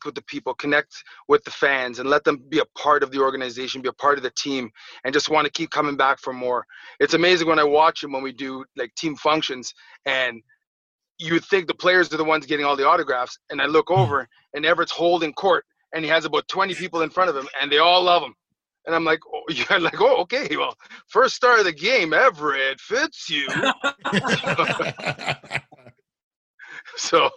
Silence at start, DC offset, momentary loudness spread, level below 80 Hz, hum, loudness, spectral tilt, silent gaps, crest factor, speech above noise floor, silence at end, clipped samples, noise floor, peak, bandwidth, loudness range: 0 s; under 0.1%; 13 LU; -64 dBFS; none; -21 LUFS; -4 dB/octave; 10.67-10.99 s, 11.11-11.15 s, 26.23-26.58 s; 18 dB; 31 dB; 0 s; under 0.1%; -53 dBFS; -4 dBFS; 10.5 kHz; 4 LU